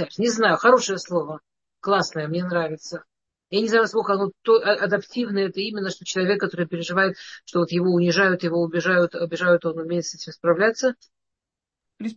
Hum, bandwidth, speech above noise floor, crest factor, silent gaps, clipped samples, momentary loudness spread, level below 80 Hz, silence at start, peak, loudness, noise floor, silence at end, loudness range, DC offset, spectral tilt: none; 8 kHz; 65 dB; 20 dB; none; under 0.1%; 10 LU; -72 dBFS; 0 s; -2 dBFS; -22 LUFS; -87 dBFS; 0.05 s; 3 LU; under 0.1%; -5 dB/octave